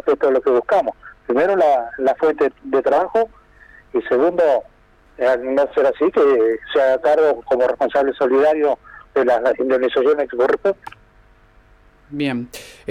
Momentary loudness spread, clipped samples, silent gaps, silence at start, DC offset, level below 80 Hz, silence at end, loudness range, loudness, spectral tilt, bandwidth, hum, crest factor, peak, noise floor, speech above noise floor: 9 LU; under 0.1%; none; 0.05 s; under 0.1%; -54 dBFS; 0.2 s; 3 LU; -18 LUFS; -6 dB/octave; 12.5 kHz; none; 10 dB; -8 dBFS; -51 dBFS; 34 dB